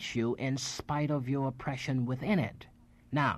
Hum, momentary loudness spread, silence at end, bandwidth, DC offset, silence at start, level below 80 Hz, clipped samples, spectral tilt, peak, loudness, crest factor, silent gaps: none; 5 LU; 0 s; 13 kHz; under 0.1%; 0 s; -60 dBFS; under 0.1%; -5.5 dB/octave; -16 dBFS; -33 LUFS; 16 dB; none